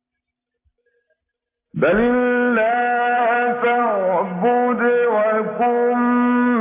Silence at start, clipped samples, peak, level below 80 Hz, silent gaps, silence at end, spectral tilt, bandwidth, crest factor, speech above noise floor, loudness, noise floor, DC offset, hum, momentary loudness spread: 1.75 s; under 0.1%; -6 dBFS; -52 dBFS; none; 0 s; -10 dB/octave; 3.8 kHz; 12 dB; 65 dB; -18 LUFS; -81 dBFS; under 0.1%; none; 3 LU